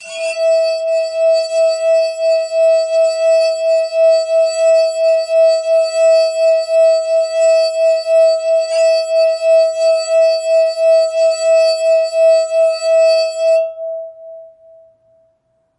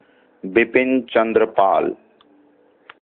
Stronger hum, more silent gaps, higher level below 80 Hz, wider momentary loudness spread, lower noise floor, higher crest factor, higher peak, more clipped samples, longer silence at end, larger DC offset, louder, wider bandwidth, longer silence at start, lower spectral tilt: neither; neither; second, -74 dBFS vs -60 dBFS; second, 3 LU vs 12 LU; first, -61 dBFS vs -55 dBFS; second, 8 dB vs 18 dB; about the same, -4 dBFS vs -2 dBFS; neither; first, 1.3 s vs 1.1 s; neither; first, -13 LUFS vs -18 LUFS; first, 11 kHz vs 4.2 kHz; second, 0 s vs 0.45 s; second, 2.5 dB/octave vs -10 dB/octave